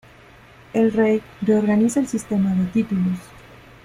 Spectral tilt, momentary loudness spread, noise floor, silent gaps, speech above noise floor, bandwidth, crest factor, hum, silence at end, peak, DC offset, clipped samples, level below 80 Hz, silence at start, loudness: -7 dB/octave; 6 LU; -47 dBFS; none; 28 dB; 14 kHz; 14 dB; none; 0.45 s; -6 dBFS; under 0.1%; under 0.1%; -52 dBFS; 0.75 s; -20 LUFS